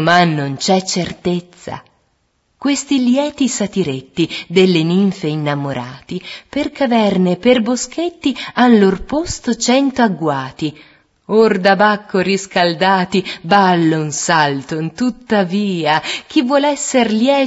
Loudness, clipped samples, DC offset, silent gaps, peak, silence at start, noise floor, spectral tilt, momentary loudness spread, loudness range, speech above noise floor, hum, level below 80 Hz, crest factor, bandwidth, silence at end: -15 LUFS; under 0.1%; under 0.1%; none; 0 dBFS; 0 s; -63 dBFS; -4.5 dB/octave; 10 LU; 4 LU; 48 dB; none; -48 dBFS; 16 dB; 8 kHz; 0 s